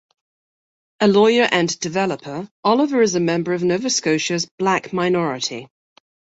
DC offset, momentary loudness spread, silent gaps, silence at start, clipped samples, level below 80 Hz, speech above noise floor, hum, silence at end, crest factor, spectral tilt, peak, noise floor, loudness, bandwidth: under 0.1%; 9 LU; 2.51-2.63 s, 4.51-4.58 s; 1 s; under 0.1%; -62 dBFS; over 72 dB; none; 0.75 s; 18 dB; -4 dB/octave; -2 dBFS; under -90 dBFS; -19 LUFS; 8 kHz